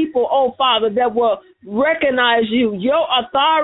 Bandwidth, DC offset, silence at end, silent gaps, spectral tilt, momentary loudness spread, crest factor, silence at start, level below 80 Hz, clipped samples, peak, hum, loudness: 4.1 kHz; under 0.1%; 0 s; none; -9.5 dB/octave; 4 LU; 14 dB; 0 s; -54 dBFS; under 0.1%; -2 dBFS; none; -16 LUFS